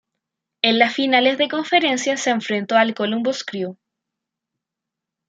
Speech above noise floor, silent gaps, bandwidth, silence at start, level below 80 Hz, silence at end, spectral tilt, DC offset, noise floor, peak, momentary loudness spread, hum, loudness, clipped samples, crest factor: 65 dB; none; 9.4 kHz; 0.65 s; -74 dBFS; 1.55 s; -3 dB/octave; under 0.1%; -84 dBFS; 0 dBFS; 9 LU; none; -19 LUFS; under 0.1%; 20 dB